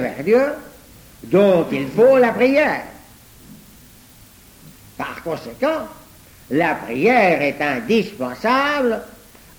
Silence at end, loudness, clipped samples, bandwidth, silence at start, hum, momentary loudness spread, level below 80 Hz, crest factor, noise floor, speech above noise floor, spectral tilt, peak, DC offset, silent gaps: 0.5 s; -18 LUFS; under 0.1%; over 20 kHz; 0 s; none; 14 LU; -52 dBFS; 16 dB; -46 dBFS; 29 dB; -6 dB/octave; -4 dBFS; under 0.1%; none